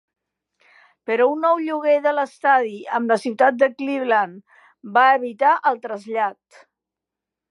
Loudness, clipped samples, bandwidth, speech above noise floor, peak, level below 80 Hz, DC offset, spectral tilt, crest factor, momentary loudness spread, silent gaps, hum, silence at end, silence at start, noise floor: -19 LUFS; under 0.1%; 11.5 kHz; 67 dB; -2 dBFS; -84 dBFS; under 0.1%; -5 dB/octave; 18 dB; 8 LU; none; none; 1.2 s; 1.1 s; -86 dBFS